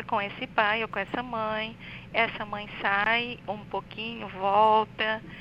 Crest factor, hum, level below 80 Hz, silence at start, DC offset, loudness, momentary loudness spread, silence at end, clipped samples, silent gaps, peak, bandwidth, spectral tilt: 20 dB; 60 Hz at -50 dBFS; -58 dBFS; 0 s; under 0.1%; -27 LUFS; 12 LU; 0 s; under 0.1%; none; -8 dBFS; 7.8 kHz; -6 dB/octave